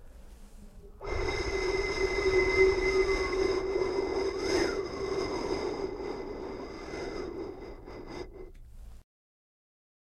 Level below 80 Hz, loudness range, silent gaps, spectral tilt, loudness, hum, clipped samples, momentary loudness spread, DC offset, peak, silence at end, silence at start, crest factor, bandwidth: -44 dBFS; 14 LU; none; -4.5 dB/octave; -31 LUFS; none; under 0.1%; 18 LU; under 0.1%; -12 dBFS; 1 s; 0 s; 20 dB; 11 kHz